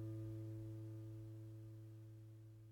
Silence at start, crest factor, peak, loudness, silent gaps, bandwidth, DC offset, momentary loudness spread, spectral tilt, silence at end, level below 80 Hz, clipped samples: 0 s; 10 dB; -42 dBFS; -54 LUFS; none; 16.5 kHz; under 0.1%; 9 LU; -9 dB/octave; 0 s; -72 dBFS; under 0.1%